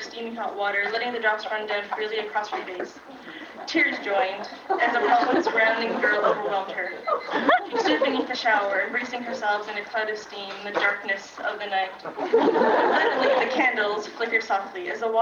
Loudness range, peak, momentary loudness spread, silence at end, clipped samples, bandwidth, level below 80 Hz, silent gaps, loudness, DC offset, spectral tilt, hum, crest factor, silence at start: 5 LU; -8 dBFS; 11 LU; 0 s; under 0.1%; 7.4 kHz; -72 dBFS; none; -24 LUFS; under 0.1%; -3.5 dB/octave; none; 18 dB; 0 s